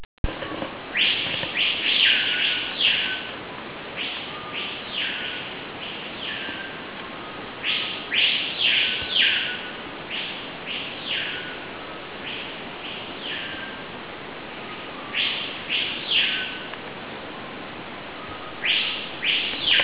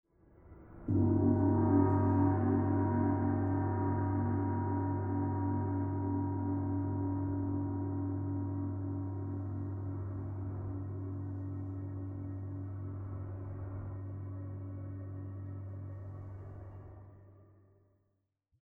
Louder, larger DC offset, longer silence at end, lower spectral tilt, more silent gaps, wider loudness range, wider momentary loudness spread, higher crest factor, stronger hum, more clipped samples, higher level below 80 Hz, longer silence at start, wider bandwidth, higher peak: first, -23 LUFS vs -35 LUFS; first, 0.1% vs under 0.1%; second, 0 s vs 1.2 s; second, 1 dB/octave vs -13.5 dB/octave; first, 0.05-0.24 s vs none; second, 9 LU vs 14 LU; about the same, 16 LU vs 15 LU; about the same, 20 dB vs 18 dB; neither; neither; first, -48 dBFS vs -58 dBFS; second, 0 s vs 0.4 s; first, 4 kHz vs 2.3 kHz; first, -6 dBFS vs -16 dBFS